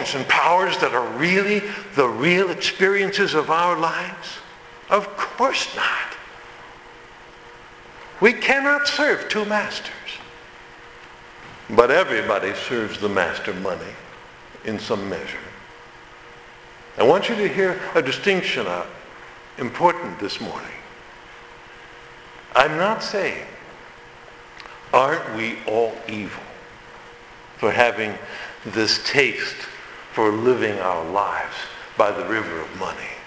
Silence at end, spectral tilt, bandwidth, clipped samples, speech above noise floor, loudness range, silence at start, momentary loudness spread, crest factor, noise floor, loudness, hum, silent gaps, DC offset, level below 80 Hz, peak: 0 s; -4 dB/octave; 8 kHz; under 0.1%; 23 dB; 6 LU; 0 s; 24 LU; 22 dB; -43 dBFS; -21 LUFS; none; none; under 0.1%; -56 dBFS; 0 dBFS